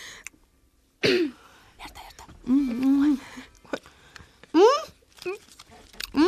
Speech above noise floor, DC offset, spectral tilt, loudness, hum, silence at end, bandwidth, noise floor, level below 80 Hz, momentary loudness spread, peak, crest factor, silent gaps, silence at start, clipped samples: 40 dB; under 0.1%; -4.5 dB/octave; -24 LUFS; none; 0 s; 14.5 kHz; -63 dBFS; -56 dBFS; 24 LU; -6 dBFS; 20 dB; none; 0 s; under 0.1%